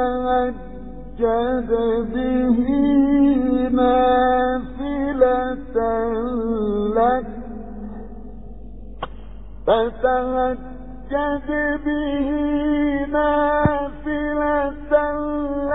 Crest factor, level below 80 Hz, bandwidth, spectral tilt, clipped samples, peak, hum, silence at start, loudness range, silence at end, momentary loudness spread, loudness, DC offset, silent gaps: 18 dB; -38 dBFS; 4 kHz; -10.5 dB/octave; under 0.1%; -4 dBFS; none; 0 s; 7 LU; 0 s; 18 LU; -20 LUFS; 1%; none